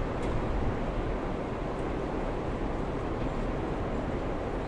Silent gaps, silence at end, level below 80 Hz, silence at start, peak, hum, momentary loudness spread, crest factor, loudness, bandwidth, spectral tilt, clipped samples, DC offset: none; 0 s; -36 dBFS; 0 s; -18 dBFS; none; 2 LU; 14 dB; -33 LUFS; 10.5 kHz; -7.5 dB/octave; under 0.1%; under 0.1%